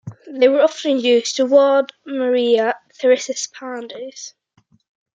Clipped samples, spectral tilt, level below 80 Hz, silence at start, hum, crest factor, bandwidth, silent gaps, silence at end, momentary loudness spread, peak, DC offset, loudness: under 0.1%; -3 dB/octave; -74 dBFS; 0.05 s; none; 16 dB; 8.8 kHz; none; 0.85 s; 18 LU; -2 dBFS; under 0.1%; -17 LUFS